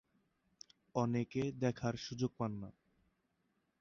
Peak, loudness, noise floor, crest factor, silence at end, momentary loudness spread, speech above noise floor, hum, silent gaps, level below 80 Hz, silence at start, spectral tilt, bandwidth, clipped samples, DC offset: -22 dBFS; -39 LUFS; -81 dBFS; 20 dB; 1.1 s; 21 LU; 43 dB; none; none; -70 dBFS; 0.95 s; -6.5 dB/octave; 7.4 kHz; under 0.1%; under 0.1%